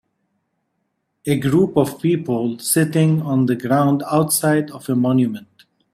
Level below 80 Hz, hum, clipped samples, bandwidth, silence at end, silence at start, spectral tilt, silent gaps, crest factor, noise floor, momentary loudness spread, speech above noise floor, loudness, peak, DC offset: -56 dBFS; none; under 0.1%; 16 kHz; 0.55 s; 1.25 s; -6 dB/octave; none; 16 dB; -72 dBFS; 6 LU; 55 dB; -18 LUFS; -2 dBFS; under 0.1%